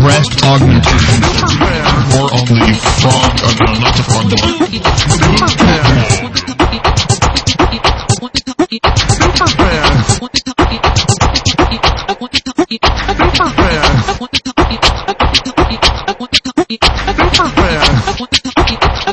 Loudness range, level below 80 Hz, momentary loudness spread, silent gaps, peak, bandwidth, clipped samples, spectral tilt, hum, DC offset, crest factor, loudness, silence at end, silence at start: 2 LU; -20 dBFS; 5 LU; none; 0 dBFS; 11 kHz; under 0.1%; -4.5 dB/octave; none; under 0.1%; 10 dB; -10 LUFS; 0 s; 0 s